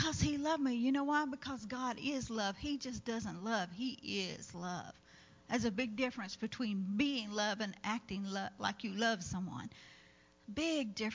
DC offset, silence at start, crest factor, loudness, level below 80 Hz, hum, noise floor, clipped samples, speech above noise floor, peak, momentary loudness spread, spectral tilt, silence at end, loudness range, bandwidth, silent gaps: under 0.1%; 0 s; 20 dB; -38 LUFS; -60 dBFS; none; -65 dBFS; under 0.1%; 26 dB; -18 dBFS; 9 LU; -4.5 dB/octave; 0 s; 3 LU; 7.6 kHz; none